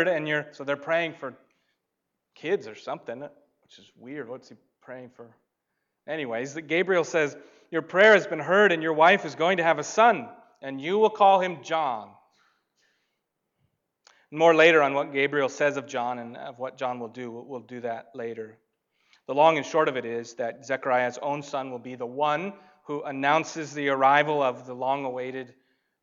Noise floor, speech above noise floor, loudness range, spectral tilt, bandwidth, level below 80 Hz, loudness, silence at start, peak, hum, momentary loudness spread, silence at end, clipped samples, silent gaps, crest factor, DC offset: -82 dBFS; 57 dB; 15 LU; -4.5 dB/octave; 7.6 kHz; -84 dBFS; -24 LUFS; 0 s; -6 dBFS; none; 20 LU; 0.55 s; under 0.1%; none; 20 dB; under 0.1%